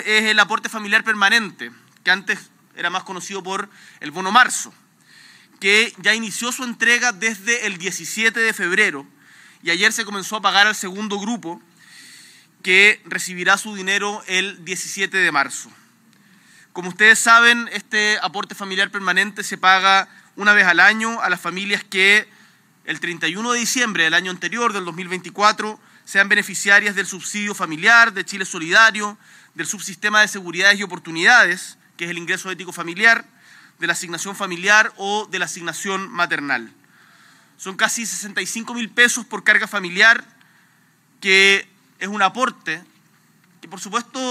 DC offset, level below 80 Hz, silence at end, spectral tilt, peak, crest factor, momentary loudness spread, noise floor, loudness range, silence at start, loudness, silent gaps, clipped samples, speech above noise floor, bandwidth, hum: under 0.1%; -86 dBFS; 0 s; -1.5 dB/octave; 0 dBFS; 20 dB; 15 LU; -57 dBFS; 5 LU; 0 s; -17 LUFS; none; under 0.1%; 38 dB; 16 kHz; none